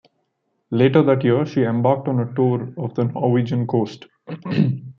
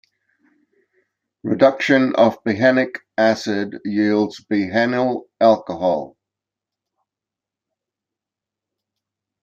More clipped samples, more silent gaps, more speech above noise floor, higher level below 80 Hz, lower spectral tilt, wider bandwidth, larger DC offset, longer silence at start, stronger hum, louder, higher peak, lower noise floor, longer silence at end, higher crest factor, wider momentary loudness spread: neither; neither; second, 52 dB vs 69 dB; first, -62 dBFS vs -68 dBFS; first, -9.5 dB/octave vs -6 dB/octave; second, 6.6 kHz vs 7.6 kHz; neither; second, 0.7 s vs 1.45 s; neither; about the same, -20 LUFS vs -18 LUFS; about the same, -2 dBFS vs -2 dBFS; second, -71 dBFS vs -87 dBFS; second, 0.05 s vs 3.35 s; about the same, 18 dB vs 18 dB; first, 11 LU vs 8 LU